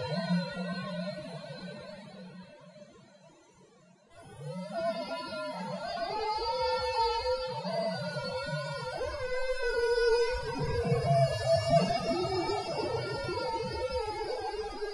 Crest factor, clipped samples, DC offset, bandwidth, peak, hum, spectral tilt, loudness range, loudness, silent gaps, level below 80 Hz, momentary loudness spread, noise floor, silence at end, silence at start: 20 dB; under 0.1%; under 0.1%; 11.5 kHz; -12 dBFS; none; -5.5 dB/octave; 14 LU; -32 LUFS; none; -50 dBFS; 16 LU; -60 dBFS; 0 s; 0 s